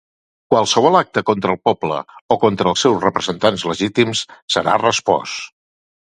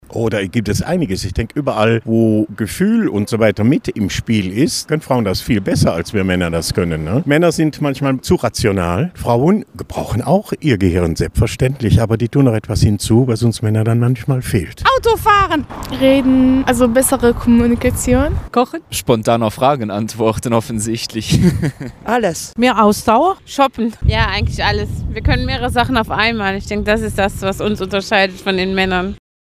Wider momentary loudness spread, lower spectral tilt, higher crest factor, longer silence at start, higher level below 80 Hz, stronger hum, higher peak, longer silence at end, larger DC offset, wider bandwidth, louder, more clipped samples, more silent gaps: about the same, 9 LU vs 7 LU; second, -4 dB/octave vs -5.5 dB/octave; about the same, 18 dB vs 14 dB; first, 0.5 s vs 0.1 s; second, -54 dBFS vs -30 dBFS; neither; about the same, 0 dBFS vs 0 dBFS; first, 0.65 s vs 0.4 s; neither; second, 11.5 kHz vs 16 kHz; about the same, -17 LUFS vs -15 LUFS; neither; first, 2.21-2.29 s, 4.42-4.48 s vs none